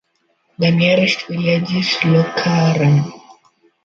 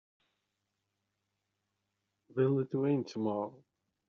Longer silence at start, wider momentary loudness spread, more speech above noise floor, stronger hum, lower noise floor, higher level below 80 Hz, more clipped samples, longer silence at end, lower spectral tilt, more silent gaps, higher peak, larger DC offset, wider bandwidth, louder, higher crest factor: second, 0.6 s vs 2.35 s; second, 5 LU vs 10 LU; second, 49 dB vs 53 dB; neither; second, -64 dBFS vs -85 dBFS; first, -58 dBFS vs -82 dBFS; neither; about the same, 0.55 s vs 0.55 s; second, -6.5 dB/octave vs -8 dB/octave; neither; first, 0 dBFS vs -18 dBFS; neither; about the same, 7.2 kHz vs 7 kHz; first, -15 LUFS vs -34 LUFS; about the same, 16 dB vs 18 dB